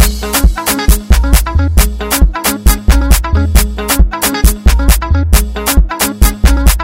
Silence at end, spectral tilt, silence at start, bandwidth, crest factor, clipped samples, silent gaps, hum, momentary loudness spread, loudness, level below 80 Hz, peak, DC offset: 0 s; -4 dB/octave; 0 s; 16.5 kHz; 8 dB; 1%; none; none; 2 LU; -11 LUFS; -10 dBFS; 0 dBFS; 0.5%